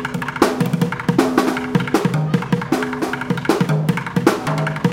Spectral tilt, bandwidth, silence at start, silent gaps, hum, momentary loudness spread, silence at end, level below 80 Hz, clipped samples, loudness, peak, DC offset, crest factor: -6.5 dB/octave; 17 kHz; 0 s; none; none; 4 LU; 0 s; -48 dBFS; under 0.1%; -19 LUFS; 0 dBFS; under 0.1%; 18 dB